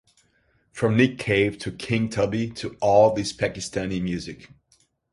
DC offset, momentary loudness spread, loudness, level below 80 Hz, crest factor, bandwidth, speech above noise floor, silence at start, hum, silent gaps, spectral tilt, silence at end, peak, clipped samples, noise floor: under 0.1%; 14 LU; -23 LUFS; -50 dBFS; 20 dB; 11.5 kHz; 42 dB; 0.75 s; none; none; -5.5 dB/octave; 0.65 s; -4 dBFS; under 0.1%; -65 dBFS